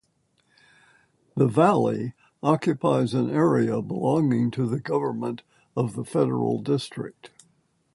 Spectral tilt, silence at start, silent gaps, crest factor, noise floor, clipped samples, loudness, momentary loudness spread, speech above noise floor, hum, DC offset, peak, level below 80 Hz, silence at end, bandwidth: -8 dB/octave; 1.35 s; none; 20 dB; -69 dBFS; under 0.1%; -24 LUFS; 14 LU; 45 dB; none; under 0.1%; -4 dBFS; -64 dBFS; 0.65 s; 11.5 kHz